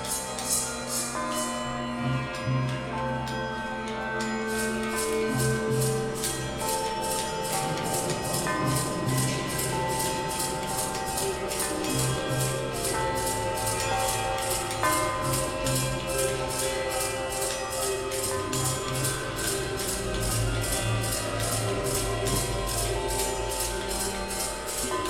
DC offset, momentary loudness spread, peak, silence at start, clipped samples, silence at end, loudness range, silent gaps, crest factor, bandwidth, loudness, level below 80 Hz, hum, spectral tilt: under 0.1%; 3 LU; -10 dBFS; 0 s; under 0.1%; 0 s; 2 LU; none; 18 dB; 19 kHz; -28 LUFS; -42 dBFS; none; -3.5 dB/octave